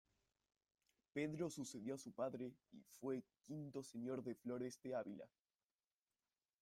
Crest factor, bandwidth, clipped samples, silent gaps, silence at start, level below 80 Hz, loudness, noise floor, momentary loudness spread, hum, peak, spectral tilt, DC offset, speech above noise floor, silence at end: 20 dB; 16 kHz; under 0.1%; none; 1.15 s; -86 dBFS; -49 LUFS; under -90 dBFS; 8 LU; none; -32 dBFS; -5.5 dB/octave; under 0.1%; over 41 dB; 1.35 s